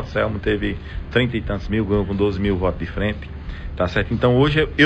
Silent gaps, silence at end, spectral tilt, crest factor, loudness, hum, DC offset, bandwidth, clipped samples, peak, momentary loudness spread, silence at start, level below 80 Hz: none; 0 s; -7.5 dB/octave; 16 dB; -21 LUFS; none; under 0.1%; 8.2 kHz; under 0.1%; -4 dBFS; 12 LU; 0 s; -32 dBFS